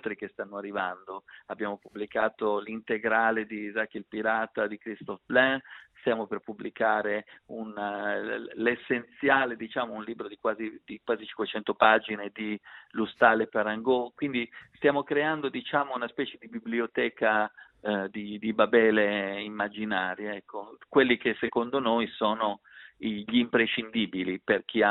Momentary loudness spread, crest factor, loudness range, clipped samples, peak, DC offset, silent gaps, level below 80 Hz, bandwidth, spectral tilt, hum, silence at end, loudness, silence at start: 14 LU; 24 dB; 3 LU; under 0.1%; -6 dBFS; under 0.1%; none; -70 dBFS; 4.1 kHz; -8.5 dB/octave; none; 0 s; -28 LUFS; 0.05 s